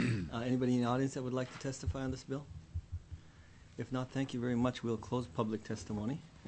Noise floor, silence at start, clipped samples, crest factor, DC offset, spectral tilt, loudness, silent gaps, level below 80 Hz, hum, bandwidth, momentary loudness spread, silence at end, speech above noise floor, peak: -58 dBFS; 0 s; under 0.1%; 18 dB; under 0.1%; -6.5 dB/octave; -38 LUFS; none; -54 dBFS; none; 8.4 kHz; 14 LU; 0 s; 21 dB; -18 dBFS